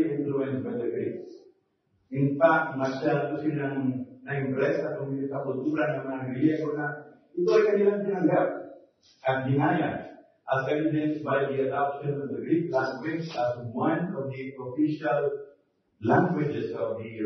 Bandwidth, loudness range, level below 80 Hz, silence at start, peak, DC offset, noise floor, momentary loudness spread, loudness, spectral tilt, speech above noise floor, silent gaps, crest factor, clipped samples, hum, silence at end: 6.2 kHz; 3 LU; -72 dBFS; 0 s; -8 dBFS; under 0.1%; -71 dBFS; 11 LU; -28 LUFS; -8.5 dB/octave; 45 dB; none; 20 dB; under 0.1%; none; 0 s